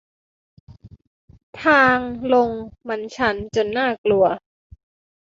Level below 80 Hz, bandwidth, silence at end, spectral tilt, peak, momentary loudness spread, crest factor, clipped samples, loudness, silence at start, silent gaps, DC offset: -52 dBFS; 7.8 kHz; 0.85 s; -5.5 dB/octave; -2 dBFS; 14 LU; 20 dB; under 0.1%; -19 LUFS; 0.7 s; 1.07-1.28 s, 1.43-1.53 s, 3.98-4.04 s; under 0.1%